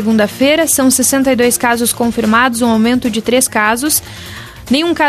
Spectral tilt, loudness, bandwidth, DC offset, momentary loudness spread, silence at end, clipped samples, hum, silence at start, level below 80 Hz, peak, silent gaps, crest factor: -3 dB/octave; -12 LUFS; 14.5 kHz; under 0.1%; 6 LU; 0 s; under 0.1%; none; 0 s; -42 dBFS; 0 dBFS; none; 12 dB